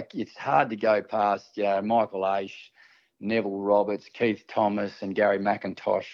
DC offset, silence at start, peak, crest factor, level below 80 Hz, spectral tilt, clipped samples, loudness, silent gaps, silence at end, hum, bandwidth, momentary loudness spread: under 0.1%; 0 s; -8 dBFS; 18 dB; -76 dBFS; -7 dB/octave; under 0.1%; -26 LUFS; none; 0 s; none; 7 kHz; 7 LU